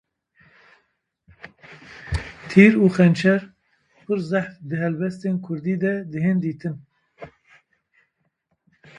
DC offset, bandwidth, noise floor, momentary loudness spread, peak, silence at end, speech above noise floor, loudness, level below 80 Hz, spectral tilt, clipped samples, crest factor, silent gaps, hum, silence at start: under 0.1%; 10 kHz; -72 dBFS; 17 LU; 0 dBFS; 1.7 s; 52 dB; -21 LUFS; -46 dBFS; -8 dB/octave; under 0.1%; 22 dB; none; none; 1.45 s